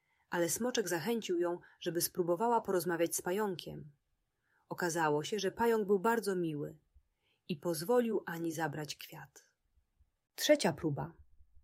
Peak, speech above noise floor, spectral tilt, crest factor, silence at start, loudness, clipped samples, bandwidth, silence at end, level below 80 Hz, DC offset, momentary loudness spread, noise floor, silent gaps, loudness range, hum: -14 dBFS; 47 dB; -4 dB/octave; 20 dB; 0.3 s; -34 LUFS; under 0.1%; 16 kHz; 0.4 s; -72 dBFS; under 0.1%; 14 LU; -82 dBFS; none; 4 LU; none